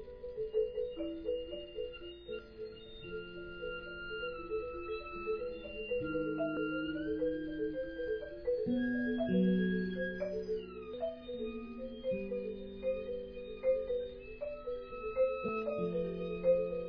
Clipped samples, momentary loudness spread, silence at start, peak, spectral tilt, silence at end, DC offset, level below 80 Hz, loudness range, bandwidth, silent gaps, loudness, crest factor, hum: under 0.1%; 12 LU; 0 s; -20 dBFS; -5.5 dB/octave; 0 s; under 0.1%; -56 dBFS; 8 LU; 5.4 kHz; none; -38 LUFS; 18 dB; none